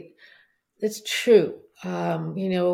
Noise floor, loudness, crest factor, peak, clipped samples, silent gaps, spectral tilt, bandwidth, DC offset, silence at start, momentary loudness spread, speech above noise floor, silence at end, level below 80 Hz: -59 dBFS; -24 LUFS; 20 dB; -6 dBFS; under 0.1%; none; -5 dB/octave; 16.5 kHz; under 0.1%; 0.8 s; 13 LU; 36 dB; 0 s; -74 dBFS